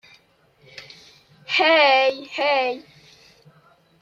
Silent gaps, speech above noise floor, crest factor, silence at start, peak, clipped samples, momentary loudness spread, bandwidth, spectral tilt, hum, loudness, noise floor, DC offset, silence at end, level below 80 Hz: none; 39 dB; 20 dB; 0.75 s; -4 dBFS; under 0.1%; 26 LU; 7.6 kHz; -2.5 dB/octave; none; -18 LUFS; -58 dBFS; under 0.1%; 1.2 s; -72 dBFS